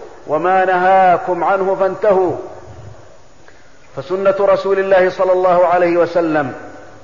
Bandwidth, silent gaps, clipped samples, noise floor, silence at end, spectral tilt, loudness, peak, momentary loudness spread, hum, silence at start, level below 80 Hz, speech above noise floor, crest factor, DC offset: 7.4 kHz; none; under 0.1%; -45 dBFS; 0.2 s; -7 dB/octave; -14 LUFS; -4 dBFS; 12 LU; none; 0 s; -52 dBFS; 32 dB; 12 dB; 1%